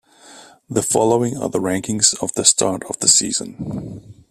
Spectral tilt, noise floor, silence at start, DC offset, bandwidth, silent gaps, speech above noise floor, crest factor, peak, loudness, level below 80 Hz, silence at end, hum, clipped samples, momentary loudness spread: -2.5 dB/octave; -44 dBFS; 0.25 s; under 0.1%; 16 kHz; none; 25 dB; 20 dB; 0 dBFS; -16 LUFS; -54 dBFS; 0.2 s; none; under 0.1%; 15 LU